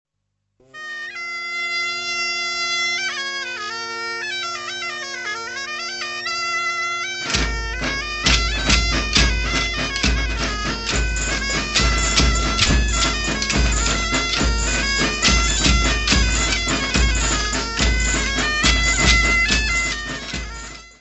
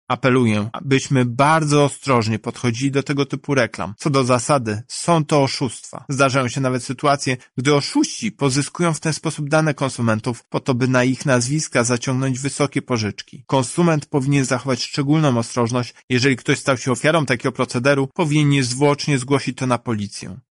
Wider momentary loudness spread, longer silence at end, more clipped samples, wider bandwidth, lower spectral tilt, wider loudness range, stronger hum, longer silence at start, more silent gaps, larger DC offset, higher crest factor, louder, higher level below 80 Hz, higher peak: first, 10 LU vs 6 LU; about the same, 0.1 s vs 0.1 s; neither; second, 8.4 kHz vs 11.5 kHz; second, -2.5 dB/octave vs -5 dB/octave; first, 6 LU vs 2 LU; neither; first, 0.75 s vs 0.1 s; second, none vs 16.03-16.08 s; neither; first, 20 dB vs 14 dB; about the same, -19 LUFS vs -19 LUFS; first, -26 dBFS vs -56 dBFS; about the same, -2 dBFS vs -4 dBFS